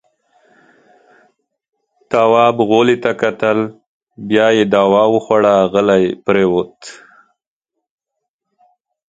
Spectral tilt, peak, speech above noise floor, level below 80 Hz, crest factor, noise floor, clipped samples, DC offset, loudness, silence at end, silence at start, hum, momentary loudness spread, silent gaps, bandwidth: -6 dB/octave; 0 dBFS; 65 dB; -56 dBFS; 16 dB; -78 dBFS; under 0.1%; under 0.1%; -13 LUFS; 2.15 s; 2.1 s; none; 9 LU; 3.87-4.07 s; 9 kHz